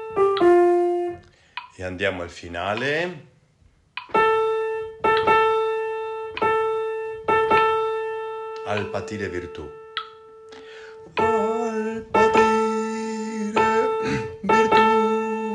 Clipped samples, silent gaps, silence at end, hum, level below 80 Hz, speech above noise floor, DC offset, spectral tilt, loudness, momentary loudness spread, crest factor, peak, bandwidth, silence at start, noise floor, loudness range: under 0.1%; none; 0 s; none; -56 dBFS; 31 dB; under 0.1%; -5 dB/octave; -22 LUFS; 16 LU; 18 dB; -4 dBFS; 11 kHz; 0 s; -58 dBFS; 7 LU